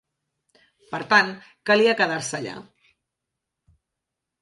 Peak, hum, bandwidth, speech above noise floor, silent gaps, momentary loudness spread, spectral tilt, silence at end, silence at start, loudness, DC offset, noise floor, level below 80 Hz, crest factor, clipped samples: -2 dBFS; none; 11.5 kHz; 62 dB; none; 16 LU; -3.5 dB/octave; 1.8 s; 0.9 s; -21 LUFS; under 0.1%; -84 dBFS; -70 dBFS; 24 dB; under 0.1%